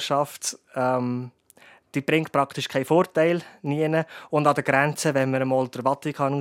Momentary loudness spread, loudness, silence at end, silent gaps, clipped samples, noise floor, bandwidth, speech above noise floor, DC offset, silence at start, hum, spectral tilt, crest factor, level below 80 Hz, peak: 9 LU; -24 LUFS; 0 s; none; under 0.1%; -54 dBFS; 16.5 kHz; 30 dB; under 0.1%; 0 s; none; -5 dB/octave; 20 dB; -74 dBFS; -4 dBFS